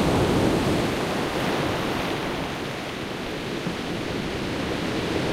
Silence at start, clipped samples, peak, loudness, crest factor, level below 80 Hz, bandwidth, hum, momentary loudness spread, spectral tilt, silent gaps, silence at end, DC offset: 0 s; under 0.1%; -10 dBFS; -26 LUFS; 16 dB; -42 dBFS; 16 kHz; none; 9 LU; -5.5 dB/octave; none; 0 s; under 0.1%